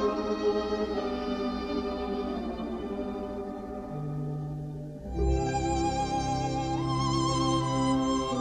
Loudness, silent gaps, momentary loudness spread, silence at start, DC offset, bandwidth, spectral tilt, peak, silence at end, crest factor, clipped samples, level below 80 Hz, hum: -30 LUFS; none; 10 LU; 0 s; under 0.1%; 10 kHz; -6 dB/octave; -16 dBFS; 0 s; 14 dB; under 0.1%; -40 dBFS; none